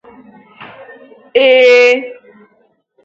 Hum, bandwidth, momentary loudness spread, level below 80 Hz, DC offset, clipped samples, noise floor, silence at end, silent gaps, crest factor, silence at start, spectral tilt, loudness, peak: none; 7.6 kHz; 11 LU; -66 dBFS; under 0.1%; under 0.1%; -56 dBFS; 0.9 s; none; 14 dB; 0.6 s; -2 dB/octave; -9 LUFS; 0 dBFS